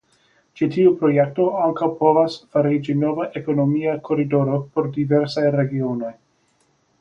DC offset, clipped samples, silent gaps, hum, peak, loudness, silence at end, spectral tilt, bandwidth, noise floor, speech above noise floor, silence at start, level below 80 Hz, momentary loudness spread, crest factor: under 0.1%; under 0.1%; none; none; -2 dBFS; -20 LUFS; 0.9 s; -9 dB/octave; 7.6 kHz; -63 dBFS; 44 dB; 0.55 s; -62 dBFS; 7 LU; 18 dB